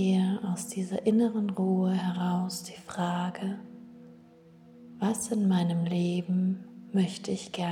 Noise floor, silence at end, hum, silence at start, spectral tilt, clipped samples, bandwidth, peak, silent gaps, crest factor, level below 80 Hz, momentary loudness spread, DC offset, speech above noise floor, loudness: -54 dBFS; 0 s; none; 0 s; -6.5 dB/octave; under 0.1%; 14 kHz; -14 dBFS; none; 16 dB; -74 dBFS; 11 LU; under 0.1%; 26 dB; -29 LUFS